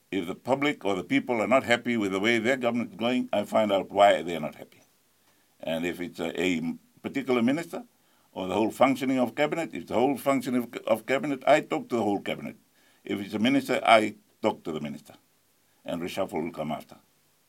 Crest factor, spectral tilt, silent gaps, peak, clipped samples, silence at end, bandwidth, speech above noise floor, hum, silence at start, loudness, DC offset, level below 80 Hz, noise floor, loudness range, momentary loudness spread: 24 dB; -5 dB/octave; none; -4 dBFS; under 0.1%; 0.55 s; 17 kHz; 40 dB; none; 0.1 s; -27 LUFS; under 0.1%; -70 dBFS; -67 dBFS; 5 LU; 13 LU